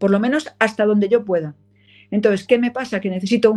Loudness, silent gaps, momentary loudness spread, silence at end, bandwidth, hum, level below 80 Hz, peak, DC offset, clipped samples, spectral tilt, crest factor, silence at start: -19 LUFS; none; 7 LU; 0 s; 11.5 kHz; 50 Hz at -40 dBFS; -62 dBFS; 0 dBFS; under 0.1%; under 0.1%; -6.5 dB/octave; 18 dB; 0 s